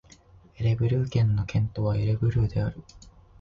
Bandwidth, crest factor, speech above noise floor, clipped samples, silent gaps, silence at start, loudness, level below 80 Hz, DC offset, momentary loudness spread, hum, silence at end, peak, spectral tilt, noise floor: 7.2 kHz; 14 dB; 29 dB; under 0.1%; none; 0.6 s; -26 LUFS; -42 dBFS; under 0.1%; 6 LU; none; 0.4 s; -12 dBFS; -8.5 dB/octave; -54 dBFS